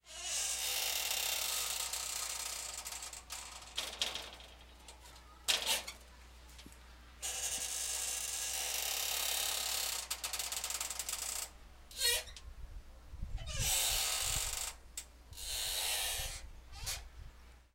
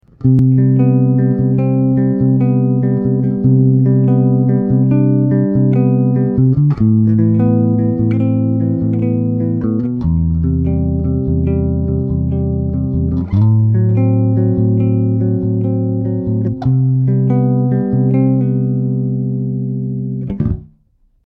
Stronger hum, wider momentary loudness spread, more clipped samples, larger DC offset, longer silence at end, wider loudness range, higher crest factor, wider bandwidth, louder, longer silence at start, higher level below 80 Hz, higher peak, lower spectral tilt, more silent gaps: neither; first, 22 LU vs 6 LU; neither; neither; second, 0.1 s vs 0.6 s; about the same, 4 LU vs 4 LU; first, 26 dB vs 12 dB; first, 17 kHz vs 2.6 kHz; second, -36 LUFS vs -14 LUFS; second, 0.05 s vs 0.2 s; second, -52 dBFS vs -32 dBFS; second, -14 dBFS vs 0 dBFS; second, 0.5 dB/octave vs -13.5 dB/octave; neither